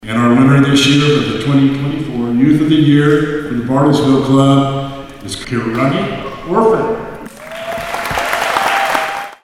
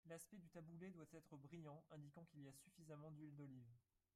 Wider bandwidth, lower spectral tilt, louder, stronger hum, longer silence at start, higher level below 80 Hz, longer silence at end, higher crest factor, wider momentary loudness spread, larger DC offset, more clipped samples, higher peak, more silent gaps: about the same, 16 kHz vs 15 kHz; about the same, -6 dB/octave vs -6.5 dB/octave; first, -13 LUFS vs -62 LUFS; neither; about the same, 0 s vs 0.05 s; first, -40 dBFS vs -90 dBFS; second, 0.1 s vs 0.35 s; about the same, 12 dB vs 16 dB; first, 14 LU vs 4 LU; neither; neither; first, 0 dBFS vs -46 dBFS; neither